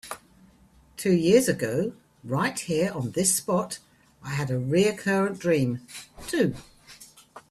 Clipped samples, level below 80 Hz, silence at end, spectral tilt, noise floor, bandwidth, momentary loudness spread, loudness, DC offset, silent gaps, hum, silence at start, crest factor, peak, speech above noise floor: under 0.1%; -58 dBFS; 0.1 s; -5 dB/octave; -57 dBFS; 15 kHz; 19 LU; -25 LUFS; under 0.1%; none; none; 0.05 s; 20 dB; -6 dBFS; 32 dB